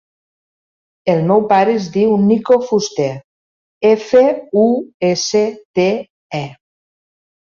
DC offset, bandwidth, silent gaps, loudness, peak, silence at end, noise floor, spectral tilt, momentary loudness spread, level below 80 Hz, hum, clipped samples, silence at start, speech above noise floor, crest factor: under 0.1%; 7.4 kHz; 3.24-3.81 s, 4.94-5.00 s, 5.65-5.74 s, 6.10-6.30 s; -15 LUFS; -2 dBFS; 0.95 s; under -90 dBFS; -5.5 dB/octave; 13 LU; -60 dBFS; none; under 0.1%; 1.05 s; over 76 dB; 14 dB